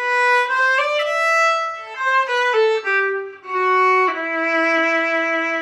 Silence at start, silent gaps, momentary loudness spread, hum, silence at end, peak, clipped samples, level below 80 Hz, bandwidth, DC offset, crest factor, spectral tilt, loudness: 0 s; none; 6 LU; none; 0 s; -8 dBFS; under 0.1%; -78 dBFS; 14.5 kHz; under 0.1%; 10 dB; -0.5 dB/octave; -17 LUFS